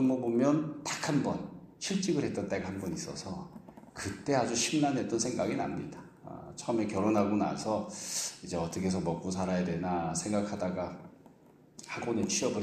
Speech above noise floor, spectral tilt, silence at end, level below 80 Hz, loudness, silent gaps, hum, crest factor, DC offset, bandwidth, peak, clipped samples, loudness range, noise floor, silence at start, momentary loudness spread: 27 dB; -4.5 dB/octave; 0 s; -62 dBFS; -32 LUFS; none; none; 18 dB; under 0.1%; 15 kHz; -14 dBFS; under 0.1%; 3 LU; -59 dBFS; 0 s; 14 LU